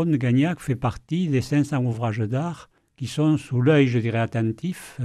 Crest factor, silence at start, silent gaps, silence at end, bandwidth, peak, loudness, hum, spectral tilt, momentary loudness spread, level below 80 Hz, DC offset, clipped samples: 16 dB; 0 s; none; 0 s; 13 kHz; -6 dBFS; -23 LUFS; none; -7.5 dB/octave; 12 LU; -52 dBFS; under 0.1%; under 0.1%